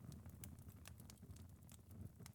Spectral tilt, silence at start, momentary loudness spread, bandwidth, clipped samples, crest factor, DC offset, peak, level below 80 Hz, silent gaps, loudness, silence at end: -5 dB/octave; 0 s; 4 LU; 19 kHz; under 0.1%; 26 dB; under 0.1%; -32 dBFS; -68 dBFS; none; -59 LUFS; 0 s